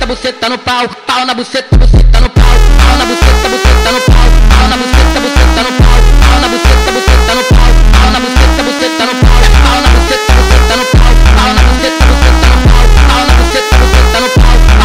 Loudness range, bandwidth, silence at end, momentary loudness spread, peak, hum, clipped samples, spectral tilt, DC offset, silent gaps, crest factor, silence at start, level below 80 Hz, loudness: 1 LU; 15.5 kHz; 0 s; 4 LU; 0 dBFS; none; 0.3%; -4.5 dB/octave; 3%; none; 6 dB; 0 s; -6 dBFS; -8 LUFS